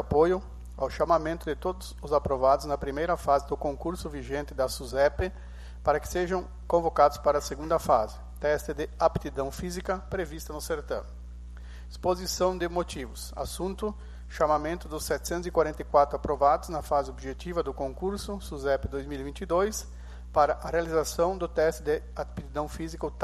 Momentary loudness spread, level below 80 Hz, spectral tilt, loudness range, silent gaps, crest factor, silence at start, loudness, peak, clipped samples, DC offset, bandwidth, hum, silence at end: 12 LU; -42 dBFS; -5 dB/octave; 5 LU; none; 20 dB; 0 s; -29 LUFS; -8 dBFS; under 0.1%; under 0.1%; 13 kHz; 60 Hz at -40 dBFS; 0 s